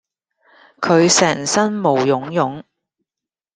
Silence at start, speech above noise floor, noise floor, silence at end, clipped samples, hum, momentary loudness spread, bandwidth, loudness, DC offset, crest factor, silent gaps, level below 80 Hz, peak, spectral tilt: 0.8 s; 72 dB; -88 dBFS; 0.95 s; under 0.1%; none; 11 LU; 10.5 kHz; -16 LUFS; under 0.1%; 18 dB; none; -60 dBFS; 0 dBFS; -3.5 dB/octave